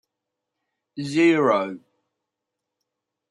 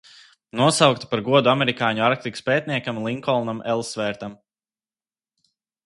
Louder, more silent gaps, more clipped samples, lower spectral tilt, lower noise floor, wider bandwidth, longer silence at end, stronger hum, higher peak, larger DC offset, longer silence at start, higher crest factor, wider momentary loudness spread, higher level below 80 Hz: about the same, -20 LUFS vs -21 LUFS; neither; neither; first, -6 dB/octave vs -4.5 dB/octave; second, -83 dBFS vs under -90 dBFS; about the same, 11 kHz vs 11.5 kHz; about the same, 1.55 s vs 1.5 s; neither; second, -6 dBFS vs 0 dBFS; neither; first, 0.95 s vs 0.55 s; about the same, 20 dB vs 22 dB; first, 22 LU vs 10 LU; second, -76 dBFS vs -62 dBFS